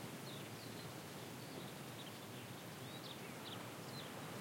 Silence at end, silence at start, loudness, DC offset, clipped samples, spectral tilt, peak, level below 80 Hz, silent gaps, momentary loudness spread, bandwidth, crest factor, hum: 0 s; 0 s; -50 LUFS; under 0.1%; under 0.1%; -4 dB/octave; -36 dBFS; -84 dBFS; none; 2 LU; 16.5 kHz; 14 dB; none